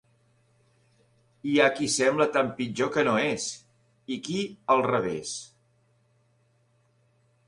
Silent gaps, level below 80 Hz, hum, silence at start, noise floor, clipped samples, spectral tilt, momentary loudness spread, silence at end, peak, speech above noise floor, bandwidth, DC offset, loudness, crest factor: none; -68 dBFS; none; 1.45 s; -67 dBFS; under 0.1%; -3.5 dB/octave; 13 LU; 2 s; -8 dBFS; 41 dB; 11.5 kHz; under 0.1%; -26 LUFS; 22 dB